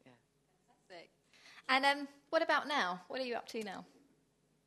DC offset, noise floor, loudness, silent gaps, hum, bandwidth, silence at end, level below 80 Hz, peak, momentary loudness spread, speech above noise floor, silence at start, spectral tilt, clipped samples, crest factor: under 0.1%; -75 dBFS; -35 LUFS; none; none; 12.5 kHz; 0.85 s; -88 dBFS; -14 dBFS; 25 LU; 40 dB; 0.05 s; -3 dB/octave; under 0.1%; 24 dB